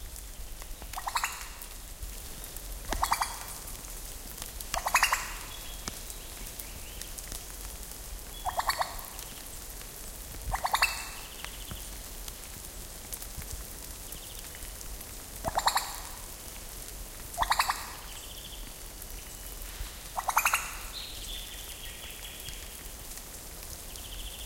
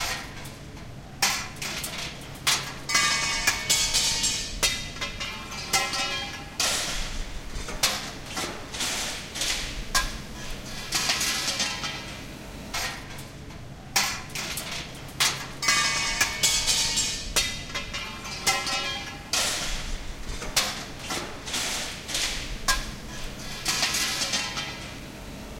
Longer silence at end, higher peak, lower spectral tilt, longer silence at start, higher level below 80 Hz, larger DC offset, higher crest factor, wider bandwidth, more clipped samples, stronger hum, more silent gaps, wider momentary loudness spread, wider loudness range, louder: about the same, 0 s vs 0 s; about the same, -10 dBFS vs -8 dBFS; about the same, -1 dB/octave vs -0.5 dB/octave; about the same, 0 s vs 0 s; about the same, -44 dBFS vs -40 dBFS; neither; first, 28 dB vs 22 dB; about the same, 17 kHz vs 17 kHz; neither; neither; neither; about the same, 14 LU vs 16 LU; first, 8 LU vs 5 LU; second, -35 LUFS vs -26 LUFS